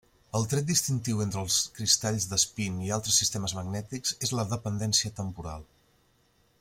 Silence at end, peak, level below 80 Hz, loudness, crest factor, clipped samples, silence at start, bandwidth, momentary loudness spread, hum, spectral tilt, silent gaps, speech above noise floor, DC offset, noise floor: 0.95 s; -8 dBFS; -56 dBFS; -28 LUFS; 22 dB; under 0.1%; 0.35 s; 16.5 kHz; 11 LU; none; -3 dB/octave; none; 37 dB; under 0.1%; -67 dBFS